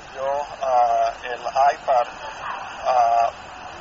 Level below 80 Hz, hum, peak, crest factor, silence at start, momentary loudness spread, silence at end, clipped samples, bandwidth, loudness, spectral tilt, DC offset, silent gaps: -54 dBFS; none; -8 dBFS; 14 dB; 0 s; 12 LU; 0 s; under 0.1%; 7.8 kHz; -22 LUFS; -0.5 dB/octave; under 0.1%; none